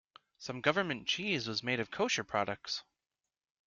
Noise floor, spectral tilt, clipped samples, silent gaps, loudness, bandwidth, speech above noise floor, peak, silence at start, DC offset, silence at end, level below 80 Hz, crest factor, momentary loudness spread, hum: under -90 dBFS; -3.5 dB/octave; under 0.1%; none; -34 LUFS; 7.6 kHz; over 55 dB; -12 dBFS; 0.4 s; under 0.1%; 0.85 s; -72 dBFS; 24 dB; 8 LU; none